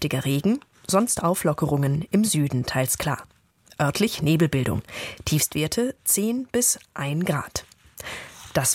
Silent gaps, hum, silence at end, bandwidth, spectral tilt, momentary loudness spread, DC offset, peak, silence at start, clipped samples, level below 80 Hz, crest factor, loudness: none; none; 0 s; 16.5 kHz; -4.5 dB/octave; 12 LU; under 0.1%; -6 dBFS; 0 s; under 0.1%; -50 dBFS; 18 dB; -24 LUFS